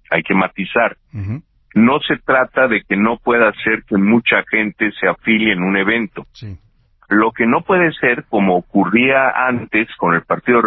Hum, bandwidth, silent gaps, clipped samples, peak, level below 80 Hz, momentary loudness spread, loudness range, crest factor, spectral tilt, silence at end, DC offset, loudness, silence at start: none; 5.6 kHz; none; under 0.1%; 0 dBFS; -48 dBFS; 8 LU; 2 LU; 16 dB; -9 dB/octave; 0 s; under 0.1%; -15 LUFS; 0.1 s